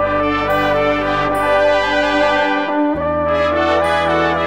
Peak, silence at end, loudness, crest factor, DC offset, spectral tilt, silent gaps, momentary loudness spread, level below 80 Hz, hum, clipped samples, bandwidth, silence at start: -2 dBFS; 0 s; -15 LUFS; 12 dB; 0.5%; -5.5 dB/octave; none; 3 LU; -36 dBFS; none; under 0.1%; 16 kHz; 0 s